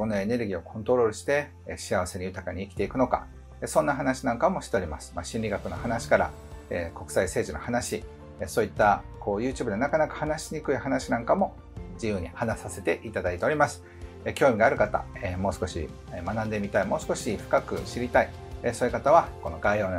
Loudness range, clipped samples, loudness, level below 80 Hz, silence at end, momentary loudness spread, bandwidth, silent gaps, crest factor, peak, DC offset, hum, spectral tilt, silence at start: 3 LU; under 0.1%; -28 LUFS; -46 dBFS; 0 s; 12 LU; 16 kHz; none; 22 dB; -6 dBFS; under 0.1%; none; -5.5 dB/octave; 0 s